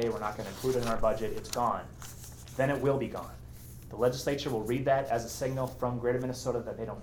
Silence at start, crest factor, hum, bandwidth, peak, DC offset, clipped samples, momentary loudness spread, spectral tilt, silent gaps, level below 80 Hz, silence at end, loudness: 0 s; 18 dB; none; 20 kHz; -14 dBFS; under 0.1%; under 0.1%; 16 LU; -5.5 dB/octave; none; -48 dBFS; 0 s; -32 LUFS